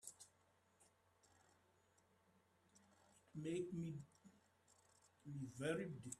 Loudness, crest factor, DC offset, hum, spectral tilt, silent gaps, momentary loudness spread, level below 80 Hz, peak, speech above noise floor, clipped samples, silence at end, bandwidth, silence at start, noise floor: -49 LUFS; 22 dB; under 0.1%; none; -5.5 dB/octave; none; 19 LU; -84 dBFS; -32 dBFS; 31 dB; under 0.1%; 0.05 s; 13 kHz; 0.05 s; -78 dBFS